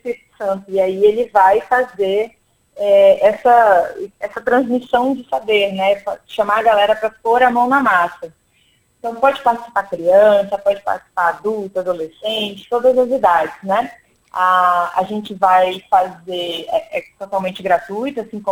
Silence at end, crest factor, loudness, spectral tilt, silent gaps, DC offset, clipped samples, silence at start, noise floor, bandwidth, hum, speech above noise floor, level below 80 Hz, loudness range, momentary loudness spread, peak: 0 s; 16 dB; -16 LUFS; -5 dB/octave; none; under 0.1%; under 0.1%; 0.05 s; -58 dBFS; 16.5 kHz; none; 42 dB; -56 dBFS; 4 LU; 12 LU; 0 dBFS